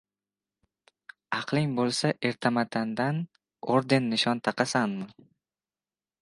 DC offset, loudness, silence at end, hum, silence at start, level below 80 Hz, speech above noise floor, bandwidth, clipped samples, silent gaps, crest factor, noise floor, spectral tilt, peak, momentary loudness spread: under 0.1%; -28 LUFS; 1.1 s; none; 1.3 s; -72 dBFS; over 63 dB; 11.5 kHz; under 0.1%; none; 22 dB; under -90 dBFS; -5 dB/octave; -8 dBFS; 10 LU